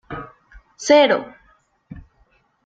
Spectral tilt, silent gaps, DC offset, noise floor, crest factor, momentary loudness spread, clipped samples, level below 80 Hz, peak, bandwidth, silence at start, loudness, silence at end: -3.5 dB/octave; none; under 0.1%; -60 dBFS; 20 dB; 26 LU; under 0.1%; -52 dBFS; 0 dBFS; 8 kHz; 0.1 s; -16 LUFS; 0.65 s